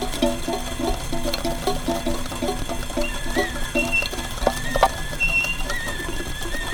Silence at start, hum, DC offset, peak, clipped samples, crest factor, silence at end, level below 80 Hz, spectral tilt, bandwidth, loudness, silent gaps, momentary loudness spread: 0 s; none; under 0.1%; -2 dBFS; under 0.1%; 20 dB; 0 s; -30 dBFS; -3.5 dB/octave; over 20 kHz; -24 LUFS; none; 8 LU